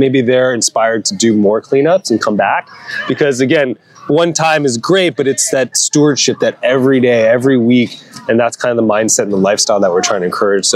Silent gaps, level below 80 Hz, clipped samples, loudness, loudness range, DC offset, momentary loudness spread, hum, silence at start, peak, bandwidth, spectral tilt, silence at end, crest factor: none; -64 dBFS; under 0.1%; -12 LUFS; 2 LU; under 0.1%; 5 LU; none; 0 s; 0 dBFS; 15 kHz; -3.5 dB/octave; 0 s; 12 dB